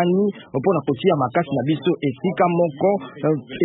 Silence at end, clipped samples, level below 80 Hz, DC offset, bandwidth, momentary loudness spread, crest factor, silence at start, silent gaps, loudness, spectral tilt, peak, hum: 0 s; under 0.1%; -62 dBFS; under 0.1%; 4.1 kHz; 4 LU; 14 dB; 0 s; none; -21 LUFS; -12.5 dB/octave; -4 dBFS; none